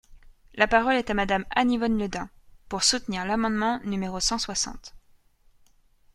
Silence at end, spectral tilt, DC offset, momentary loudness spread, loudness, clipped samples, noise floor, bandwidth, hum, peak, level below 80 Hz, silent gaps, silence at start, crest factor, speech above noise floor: 1.15 s; -3 dB/octave; under 0.1%; 12 LU; -25 LUFS; under 0.1%; -60 dBFS; 12.5 kHz; none; -4 dBFS; -46 dBFS; none; 0.1 s; 22 dB; 34 dB